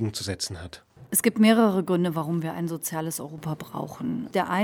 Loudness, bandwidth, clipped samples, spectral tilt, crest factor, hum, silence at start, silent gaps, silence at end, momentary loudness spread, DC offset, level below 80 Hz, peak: -25 LUFS; 18 kHz; under 0.1%; -5 dB/octave; 18 dB; none; 0 s; none; 0 s; 14 LU; under 0.1%; -60 dBFS; -6 dBFS